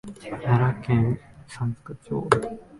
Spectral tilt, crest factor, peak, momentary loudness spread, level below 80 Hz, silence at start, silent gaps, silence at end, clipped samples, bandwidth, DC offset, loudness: -7.5 dB/octave; 24 dB; -2 dBFS; 14 LU; -50 dBFS; 0.05 s; none; 0 s; under 0.1%; 11.5 kHz; under 0.1%; -25 LUFS